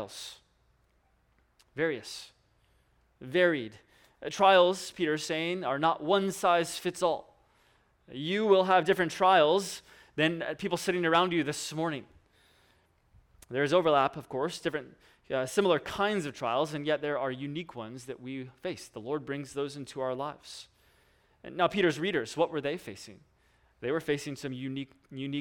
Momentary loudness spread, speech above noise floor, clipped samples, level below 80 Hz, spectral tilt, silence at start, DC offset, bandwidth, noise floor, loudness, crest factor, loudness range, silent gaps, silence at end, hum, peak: 17 LU; 40 dB; under 0.1%; -68 dBFS; -4.5 dB/octave; 0 s; under 0.1%; 18 kHz; -69 dBFS; -29 LUFS; 22 dB; 9 LU; none; 0 s; none; -10 dBFS